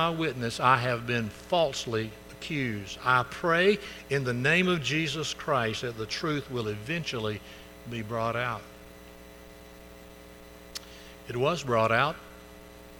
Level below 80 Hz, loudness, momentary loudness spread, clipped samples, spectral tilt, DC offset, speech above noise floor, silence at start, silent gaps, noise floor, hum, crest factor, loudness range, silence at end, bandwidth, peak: -56 dBFS; -28 LUFS; 25 LU; under 0.1%; -5 dB/octave; under 0.1%; 20 dB; 0 s; none; -49 dBFS; none; 22 dB; 10 LU; 0 s; 19 kHz; -8 dBFS